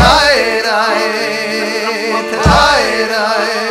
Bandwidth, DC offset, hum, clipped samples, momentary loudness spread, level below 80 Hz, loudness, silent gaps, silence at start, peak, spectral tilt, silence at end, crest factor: 16.5 kHz; under 0.1%; none; 0.2%; 7 LU; -26 dBFS; -12 LUFS; none; 0 s; 0 dBFS; -3.5 dB/octave; 0 s; 12 dB